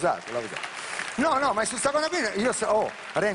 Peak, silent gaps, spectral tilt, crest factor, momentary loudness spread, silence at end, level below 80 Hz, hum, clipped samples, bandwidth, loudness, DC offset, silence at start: -10 dBFS; none; -3 dB/octave; 16 dB; 8 LU; 0 s; -60 dBFS; none; under 0.1%; 11 kHz; -26 LUFS; under 0.1%; 0 s